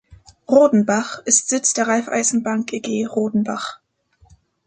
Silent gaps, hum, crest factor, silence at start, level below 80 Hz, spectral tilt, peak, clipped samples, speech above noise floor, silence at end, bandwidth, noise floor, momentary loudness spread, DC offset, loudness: none; none; 18 dB; 0.1 s; -60 dBFS; -3.5 dB/octave; -2 dBFS; under 0.1%; 39 dB; 0.9 s; 9.6 kHz; -57 dBFS; 9 LU; under 0.1%; -18 LUFS